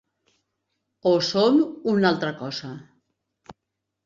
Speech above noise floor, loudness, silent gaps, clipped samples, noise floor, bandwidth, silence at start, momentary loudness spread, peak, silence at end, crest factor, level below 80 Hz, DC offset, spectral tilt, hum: 60 dB; -22 LUFS; none; under 0.1%; -82 dBFS; 7.6 kHz; 1.05 s; 14 LU; -6 dBFS; 0.55 s; 18 dB; -66 dBFS; under 0.1%; -5.5 dB/octave; none